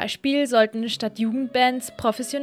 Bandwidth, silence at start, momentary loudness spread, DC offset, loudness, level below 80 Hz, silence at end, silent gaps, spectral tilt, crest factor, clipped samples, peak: 16 kHz; 0 s; 6 LU; under 0.1%; -22 LUFS; -60 dBFS; 0 s; none; -3.5 dB/octave; 16 dB; under 0.1%; -6 dBFS